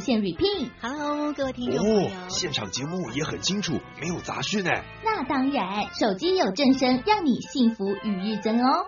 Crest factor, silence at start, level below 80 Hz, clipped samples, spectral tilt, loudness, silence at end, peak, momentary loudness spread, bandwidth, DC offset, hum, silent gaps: 18 dB; 0 s; -54 dBFS; under 0.1%; -3.5 dB/octave; -25 LUFS; 0 s; -8 dBFS; 8 LU; 7.2 kHz; under 0.1%; none; none